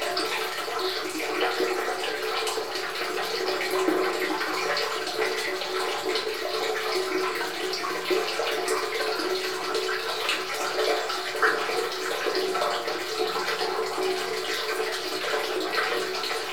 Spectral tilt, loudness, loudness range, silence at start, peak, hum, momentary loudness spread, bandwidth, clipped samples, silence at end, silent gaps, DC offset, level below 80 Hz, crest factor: -1.5 dB/octave; -27 LUFS; 1 LU; 0 s; -10 dBFS; none; 3 LU; 19.5 kHz; under 0.1%; 0 s; none; 0.5%; -74 dBFS; 18 dB